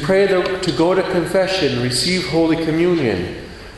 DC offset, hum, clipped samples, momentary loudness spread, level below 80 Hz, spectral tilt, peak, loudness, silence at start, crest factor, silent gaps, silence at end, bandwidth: under 0.1%; none; under 0.1%; 5 LU; -42 dBFS; -5 dB/octave; -4 dBFS; -17 LUFS; 0 s; 12 dB; none; 0 s; 12 kHz